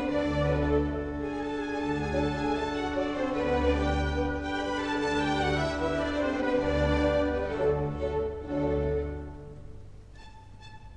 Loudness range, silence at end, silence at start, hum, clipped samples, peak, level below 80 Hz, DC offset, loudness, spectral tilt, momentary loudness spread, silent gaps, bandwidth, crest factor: 3 LU; 0 s; 0 s; none; under 0.1%; -14 dBFS; -38 dBFS; under 0.1%; -29 LUFS; -6.5 dB/octave; 7 LU; none; 10 kHz; 14 dB